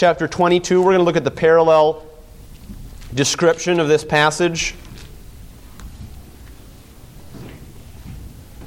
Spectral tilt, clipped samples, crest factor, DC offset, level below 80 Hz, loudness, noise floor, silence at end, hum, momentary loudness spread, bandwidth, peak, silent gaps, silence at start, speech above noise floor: -4.5 dB/octave; under 0.1%; 16 dB; under 0.1%; -40 dBFS; -16 LUFS; -41 dBFS; 0 s; none; 24 LU; 16.5 kHz; -2 dBFS; none; 0 s; 25 dB